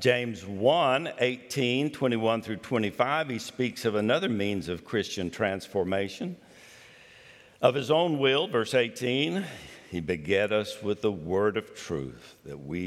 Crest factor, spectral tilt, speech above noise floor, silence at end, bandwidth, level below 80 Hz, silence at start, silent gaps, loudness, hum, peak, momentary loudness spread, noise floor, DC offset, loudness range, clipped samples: 22 dB; -5 dB/octave; 26 dB; 0 s; 15 kHz; -64 dBFS; 0 s; none; -28 LUFS; none; -8 dBFS; 11 LU; -53 dBFS; under 0.1%; 3 LU; under 0.1%